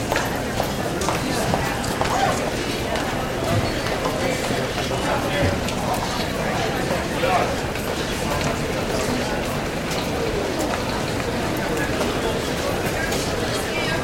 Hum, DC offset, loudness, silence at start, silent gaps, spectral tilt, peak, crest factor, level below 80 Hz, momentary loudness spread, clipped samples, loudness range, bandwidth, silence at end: none; under 0.1%; -23 LUFS; 0 s; none; -4.5 dB/octave; -4 dBFS; 18 dB; -36 dBFS; 3 LU; under 0.1%; 1 LU; 16.5 kHz; 0 s